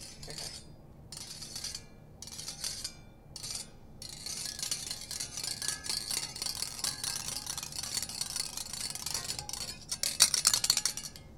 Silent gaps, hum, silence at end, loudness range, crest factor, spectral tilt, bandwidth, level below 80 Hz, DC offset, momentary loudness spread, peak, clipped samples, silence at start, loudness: none; none; 0 s; 11 LU; 32 dB; 0 dB/octave; 18 kHz; -58 dBFS; under 0.1%; 17 LU; -4 dBFS; under 0.1%; 0 s; -33 LUFS